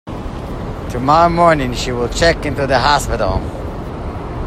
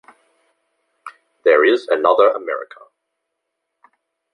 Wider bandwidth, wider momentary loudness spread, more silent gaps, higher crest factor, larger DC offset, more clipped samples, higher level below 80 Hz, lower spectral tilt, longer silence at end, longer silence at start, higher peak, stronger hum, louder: first, 15 kHz vs 9.2 kHz; about the same, 14 LU vs 14 LU; neither; about the same, 16 dB vs 18 dB; neither; neither; first, -28 dBFS vs -72 dBFS; about the same, -5 dB/octave vs -4 dB/octave; second, 0 s vs 1.7 s; second, 0.05 s vs 1.05 s; about the same, 0 dBFS vs -2 dBFS; neither; about the same, -16 LUFS vs -16 LUFS